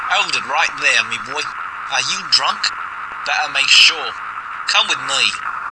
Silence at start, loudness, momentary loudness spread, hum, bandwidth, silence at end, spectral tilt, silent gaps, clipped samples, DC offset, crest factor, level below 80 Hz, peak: 0 s; -15 LUFS; 15 LU; none; 11 kHz; 0 s; 1.5 dB/octave; none; under 0.1%; under 0.1%; 18 dB; -58 dBFS; 0 dBFS